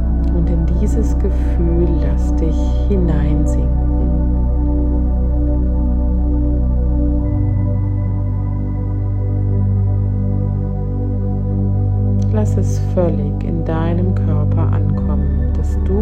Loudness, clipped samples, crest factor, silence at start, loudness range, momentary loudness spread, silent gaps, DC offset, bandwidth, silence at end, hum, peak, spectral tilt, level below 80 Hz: -17 LUFS; under 0.1%; 12 dB; 0 s; 2 LU; 4 LU; none; under 0.1%; 7.8 kHz; 0 s; none; -4 dBFS; -9.5 dB/octave; -18 dBFS